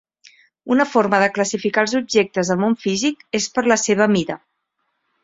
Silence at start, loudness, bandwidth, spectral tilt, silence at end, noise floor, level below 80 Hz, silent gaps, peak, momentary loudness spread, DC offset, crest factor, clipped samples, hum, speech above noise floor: 0.65 s; -18 LUFS; 8 kHz; -4 dB/octave; 0.85 s; -72 dBFS; -60 dBFS; none; 0 dBFS; 5 LU; under 0.1%; 18 dB; under 0.1%; none; 54 dB